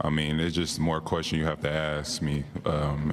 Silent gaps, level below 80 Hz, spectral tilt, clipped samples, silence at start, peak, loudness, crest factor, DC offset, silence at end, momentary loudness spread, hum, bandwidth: none; -42 dBFS; -5 dB/octave; under 0.1%; 0 s; -12 dBFS; -28 LUFS; 14 dB; under 0.1%; 0 s; 3 LU; none; 14 kHz